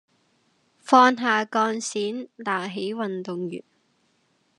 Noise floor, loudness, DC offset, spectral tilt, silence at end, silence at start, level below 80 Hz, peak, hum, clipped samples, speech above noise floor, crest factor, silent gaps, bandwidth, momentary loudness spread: -67 dBFS; -23 LUFS; under 0.1%; -4 dB/octave; 1 s; 0.85 s; -86 dBFS; -2 dBFS; none; under 0.1%; 44 dB; 22 dB; none; 11 kHz; 15 LU